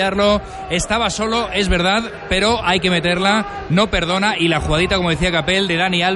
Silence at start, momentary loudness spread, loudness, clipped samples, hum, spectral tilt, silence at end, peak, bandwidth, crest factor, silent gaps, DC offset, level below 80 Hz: 0 s; 4 LU; -17 LUFS; under 0.1%; none; -4.5 dB/octave; 0 s; -4 dBFS; 11.5 kHz; 14 dB; none; under 0.1%; -32 dBFS